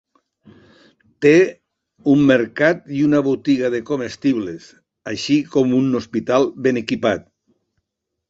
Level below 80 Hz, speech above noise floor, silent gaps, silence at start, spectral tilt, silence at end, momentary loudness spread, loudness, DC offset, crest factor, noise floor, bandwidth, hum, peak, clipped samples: -58 dBFS; 61 dB; none; 1.2 s; -6 dB/octave; 1.1 s; 11 LU; -18 LUFS; under 0.1%; 18 dB; -78 dBFS; 7.8 kHz; none; -2 dBFS; under 0.1%